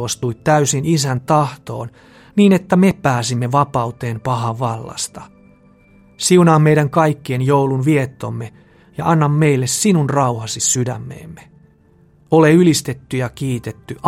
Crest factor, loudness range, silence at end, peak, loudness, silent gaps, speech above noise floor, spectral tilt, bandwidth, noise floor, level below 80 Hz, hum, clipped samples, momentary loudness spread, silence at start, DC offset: 16 dB; 2 LU; 0 s; 0 dBFS; -16 LUFS; none; 35 dB; -5.5 dB/octave; 15.5 kHz; -51 dBFS; -52 dBFS; none; under 0.1%; 15 LU; 0 s; under 0.1%